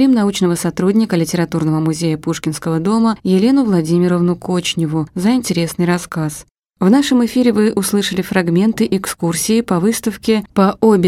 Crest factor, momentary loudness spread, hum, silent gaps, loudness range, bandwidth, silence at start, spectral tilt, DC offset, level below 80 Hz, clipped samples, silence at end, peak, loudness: 14 dB; 6 LU; none; 6.51-6.55 s; 1 LU; 16 kHz; 0 s; -5.5 dB/octave; under 0.1%; -48 dBFS; under 0.1%; 0 s; 0 dBFS; -15 LUFS